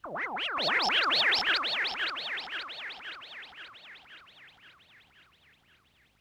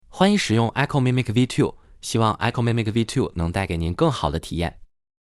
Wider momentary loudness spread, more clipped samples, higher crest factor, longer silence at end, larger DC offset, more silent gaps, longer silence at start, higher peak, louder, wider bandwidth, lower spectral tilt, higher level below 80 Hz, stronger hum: first, 23 LU vs 7 LU; neither; about the same, 16 dB vs 18 dB; first, 1.5 s vs 0.4 s; neither; neither; about the same, 0.05 s vs 0.15 s; second, -16 dBFS vs -4 dBFS; second, -28 LUFS vs -22 LUFS; first, over 20 kHz vs 12.5 kHz; second, -1 dB/octave vs -6 dB/octave; second, -72 dBFS vs -40 dBFS; neither